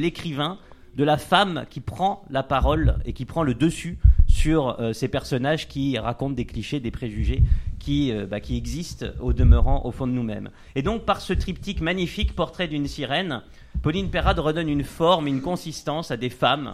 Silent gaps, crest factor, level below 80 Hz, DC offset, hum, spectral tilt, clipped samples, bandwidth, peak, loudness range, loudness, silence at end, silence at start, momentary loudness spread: none; 20 dB; -26 dBFS; under 0.1%; none; -6.5 dB/octave; under 0.1%; 14 kHz; -2 dBFS; 3 LU; -24 LUFS; 0 s; 0 s; 10 LU